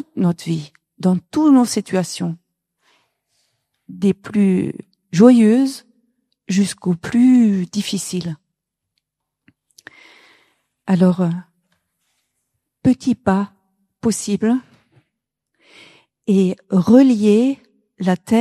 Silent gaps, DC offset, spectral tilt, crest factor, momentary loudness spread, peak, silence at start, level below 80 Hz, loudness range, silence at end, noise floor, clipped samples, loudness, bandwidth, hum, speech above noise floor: none; under 0.1%; -6.5 dB/octave; 18 dB; 15 LU; 0 dBFS; 0.15 s; -58 dBFS; 8 LU; 0 s; -78 dBFS; under 0.1%; -17 LUFS; 13.5 kHz; none; 63 dB